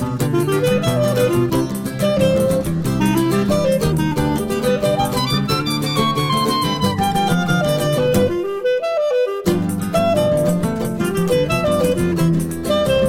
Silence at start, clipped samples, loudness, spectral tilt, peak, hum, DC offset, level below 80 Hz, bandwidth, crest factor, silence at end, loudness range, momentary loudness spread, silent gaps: 0 s; under 0.1%; -18 LUFS; -6 dB/octave; -2 dBFS; none; under 0.1%; -38 dBFS; 16.5 kHz; 14 dB; 0 s; 1 LU; 3 LU; none